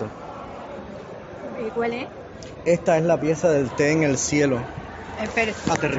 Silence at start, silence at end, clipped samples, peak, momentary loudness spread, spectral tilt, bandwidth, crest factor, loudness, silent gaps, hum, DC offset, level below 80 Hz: 0 s; 0 s; under 0.1%; -4 dBFS; 17 LU; -5 dB/octave; 8 kHz; 20 dB; -22 LUFS; none; none; under 0.1%; -50 dBFS